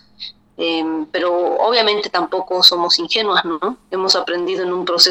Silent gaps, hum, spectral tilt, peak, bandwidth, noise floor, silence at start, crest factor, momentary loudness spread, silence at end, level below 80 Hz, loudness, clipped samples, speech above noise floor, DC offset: none; none; -2 dB/octave; 0 dBFS; over 20 kHz; -37 dBFS; 0.2 s; 18 dB; 12 LU; 0 s; -60 dBFS; -16 LUFS; under 0.1%; 20 dB; under 0.1%